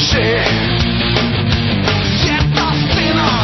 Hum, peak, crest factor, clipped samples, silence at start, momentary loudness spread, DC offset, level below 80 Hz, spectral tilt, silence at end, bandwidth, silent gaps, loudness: none; 0 dBFS; 14 dB; under 0.1%; 0 s; 2 LU; 0.4%; -26 dBFS; -5.5 dB/octave; 0 s; 6.4 kHz; none; -14 LUFS